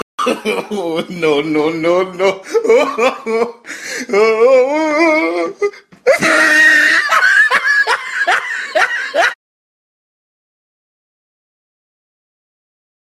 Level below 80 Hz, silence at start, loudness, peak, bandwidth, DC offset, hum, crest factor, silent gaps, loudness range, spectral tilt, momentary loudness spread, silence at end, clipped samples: -62 dBFS; 0.2 s; -13 LUFS; 0 dBFS; 14 kHz; under 0.1%; none; 14 dB; none; 8 LU; -3 dB/octave; 11 LU; 3.65 s; under 0.1%